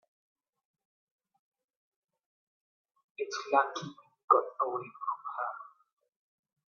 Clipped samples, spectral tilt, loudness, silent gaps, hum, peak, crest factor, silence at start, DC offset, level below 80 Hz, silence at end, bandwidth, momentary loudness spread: under 0.1%; -2 dB/octave; -32 LUFS; 4.24-4.28 s; none; -10 dBFS; 28 dB; 3.2 s; under 0.1%; -90 dBFS; 1 s; 7 kHz; 17 LU